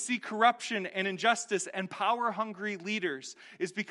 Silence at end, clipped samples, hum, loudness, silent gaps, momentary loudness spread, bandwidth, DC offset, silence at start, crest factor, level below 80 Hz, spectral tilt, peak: 0 s; under 0.1%; none; -31 LUFS; none; 10 LU; 11.5 kHz; under 0.1%; 0 s; 22 dB; -90 dBFS; -3 dB/octave; -10 dBFS